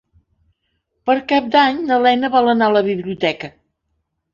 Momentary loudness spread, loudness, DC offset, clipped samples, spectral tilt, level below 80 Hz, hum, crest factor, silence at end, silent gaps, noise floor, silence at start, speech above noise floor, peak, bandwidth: 9 LU; -16 LUFS; under 0.1%; under 0.1%; -6 dB/octave; -58 dBFS; none; 16 dB; 0.85 s; none; -71 dBFS; 1.05 s; 56 dB; -2 dBFS; 7.2 kHz